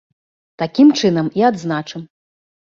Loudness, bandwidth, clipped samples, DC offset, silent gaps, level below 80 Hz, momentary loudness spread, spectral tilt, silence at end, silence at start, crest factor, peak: -16 LUFS; 7.4 kHz; under 0.1%; under 0.1%; none; -60 dBFS; 16 LU; -6 dB/octave; 0.75 s; 0.6 s; 16 dB; -2 dBFS